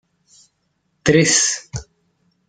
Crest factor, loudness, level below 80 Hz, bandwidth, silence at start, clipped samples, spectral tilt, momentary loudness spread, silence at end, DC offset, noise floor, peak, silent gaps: 20 dB; -16 LUFS; -48 dBFS; 10.5 kHz; 1.05 s; under 0.1%; -3 dB/octave; 20 LU; 0.65 s; under 0.1%; -68 dBFS; -2 dBFS; none